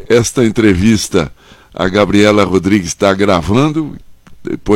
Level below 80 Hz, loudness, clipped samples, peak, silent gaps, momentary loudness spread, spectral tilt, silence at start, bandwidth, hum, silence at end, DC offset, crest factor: -34 dBFS; -12 LUFS; under 0.1%; 0 dBFS; none; 15 LU; -5.5 dB/octave; 0 s; 16.5 kHz; none; 0 s; under 0.1%; 12 dB